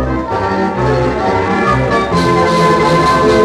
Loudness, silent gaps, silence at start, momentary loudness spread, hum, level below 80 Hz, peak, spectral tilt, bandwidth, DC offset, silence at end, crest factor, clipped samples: -12 LUFS; none; 0 s; 5 LU; none; -28 dBFS; -2 dBFS; -6 dB/octave; 13.5 kHz; under 0.1%; 0 s; 10 dB; under 0.1%